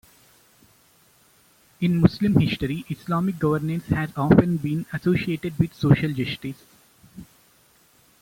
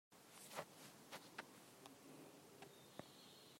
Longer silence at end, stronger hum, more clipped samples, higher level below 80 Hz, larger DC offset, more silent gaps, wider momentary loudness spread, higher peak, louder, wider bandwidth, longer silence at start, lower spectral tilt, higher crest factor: first, 1 s vs 0 s; neither; neither; first, -48 dBFS vs under -90 dBFS; neither; neither; about the same, 10 LU vs 8 LU; first, -2 dBFS vs -34 dBFS; first, -23 LUFS vs -59 LUFS; about the same, 16.5 kHz vs 16 kHz; first, 1.8 s vs 0.1 s; first, -8 dB/octave vs -3 dB/octave; about the same, 22 dB vs 26 dB